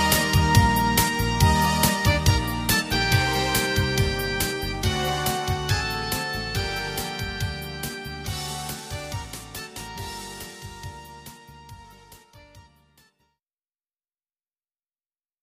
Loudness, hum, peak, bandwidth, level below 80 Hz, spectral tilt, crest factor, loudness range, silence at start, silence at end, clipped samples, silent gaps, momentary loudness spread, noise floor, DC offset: -23 LUFS; none; -4 dBFS; 15.5 kHz; -36 dBFS; -4 dB/octave; 22 dB; 18 LU; 0 s; 2.8 s; under 0.1%; none; 16 LU; under -90 dBFS; under 0.1%